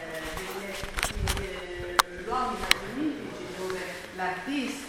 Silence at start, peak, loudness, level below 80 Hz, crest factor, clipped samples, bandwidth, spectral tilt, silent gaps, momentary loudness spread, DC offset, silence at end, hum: 0 s; 0 dBFS; -30 LUFS; -42 dBFS; 30 dB; under 0.1%; 17 kHz; -3 dB/octave; none; 10 LU; under 0.1%; 0 s; none